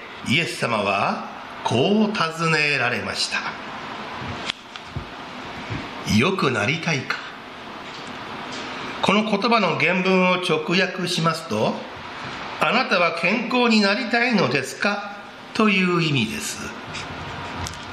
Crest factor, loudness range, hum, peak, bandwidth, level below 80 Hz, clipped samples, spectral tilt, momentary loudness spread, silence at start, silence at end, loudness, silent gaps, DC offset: 22 dB; 4 LU; none; 0 dBFS; 14 kHz; -52 dBFS; under 0.1%; -4.5 dB/octave; 15 LU; 0 s; 0 s; -21 LUFS; none; under 0.1%